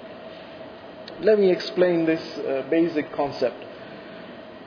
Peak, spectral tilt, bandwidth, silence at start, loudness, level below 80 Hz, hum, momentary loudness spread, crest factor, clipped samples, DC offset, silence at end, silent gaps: -8 dBFS; -7 dB/octave; 5.4 kHz; 0 s; -23 LUFS; -64 dBFS; none; 20 LU; 18 dB; under 0.1%; under 0.1%; 0 s; none